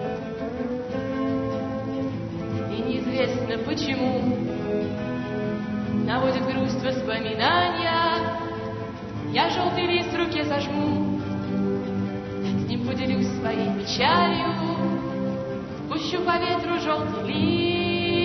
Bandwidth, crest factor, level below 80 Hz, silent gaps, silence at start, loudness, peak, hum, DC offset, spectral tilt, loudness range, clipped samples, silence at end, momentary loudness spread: 6.4 kHz; 18 dB; -50 dBFS; none; 0 s; -25 LUFS; -8 dBFS; none; under 0.1%; -6 dB/octave; 3 LU; under 0.1%; 0 s; 8 LU